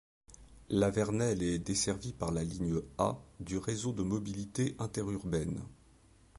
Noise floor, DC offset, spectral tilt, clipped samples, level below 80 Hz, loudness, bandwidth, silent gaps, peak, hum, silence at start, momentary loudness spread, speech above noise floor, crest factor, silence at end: -62 dBFS; under 0.1%; -5.5 dB/octave; under 0.1%; -52 dBFS; -35 LUFS; 11.5 kHz; none; -16 dBFS; none; 0.3 s; 7 LU; 28 dB; 20 dB; 0.65 s